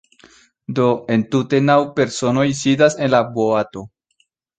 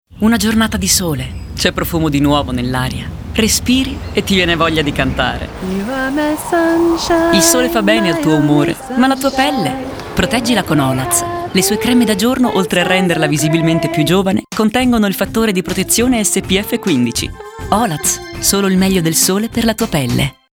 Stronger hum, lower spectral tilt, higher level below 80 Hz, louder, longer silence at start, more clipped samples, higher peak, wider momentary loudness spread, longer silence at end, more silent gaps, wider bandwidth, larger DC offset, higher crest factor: neither; first, -5.5 dB/octave vs -4 dB/octave; second, -56 dBFS vs -32 dBFS; second, -17 LUFS vs -14 LUFS; first, 0.7 s vs 0.1 s; neither; about the same, -2 dBFS vs 0 dBFS; first, 9 LU vs 6 LU; first, 0.7 s vs 0.2 s; neither; second, 9.4 kHz vs over 20 kHz; neither; about the same, 16 dB vs 14 dB